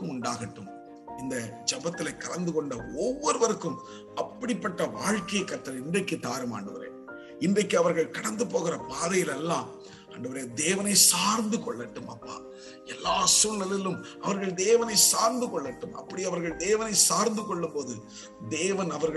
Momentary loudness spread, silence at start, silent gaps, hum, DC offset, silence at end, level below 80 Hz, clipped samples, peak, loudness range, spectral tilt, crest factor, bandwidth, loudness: 21 LU; 0 s; none; none; under 0.1%; 0 s; -62 dBFS; under 0.1%; -6 dBFS; 7 LU; -2.5 dB/octave; 22 dB; 13 kHz; -27 LUFS